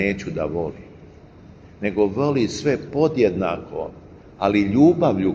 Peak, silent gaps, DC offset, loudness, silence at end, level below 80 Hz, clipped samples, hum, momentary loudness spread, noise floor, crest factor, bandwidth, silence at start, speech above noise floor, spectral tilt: -4 dBFS; none; under 0.1%; -21 LUFS; 0 s; -48 dBFS; under 0.1%; none; 15 LU; -45 dBFS; 18 dB; 7.6 kHz; 0 s; 25 dB; -7 dB/octave